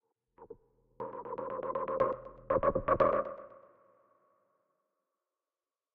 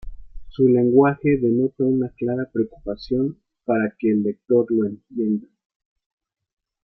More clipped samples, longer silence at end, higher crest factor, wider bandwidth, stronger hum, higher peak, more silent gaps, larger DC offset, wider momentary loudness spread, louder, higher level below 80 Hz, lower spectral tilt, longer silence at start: neither; first, 2.35 s vs 1.45 s; first, 24 dB vs 18 dB; second, 4.6 kHz vs 5.8 kHz; neither; second, -14 dBFS vs -4 dBFS; neither; neither; first, 26 LU vs 11 LU; second, -33 LUFS vs -21 LUFS; second, -58 dBFS vs -46 dBFS; second, -6.5 dB/octave vs -11 dB/octave; first, 0.4 s vs 0.05 s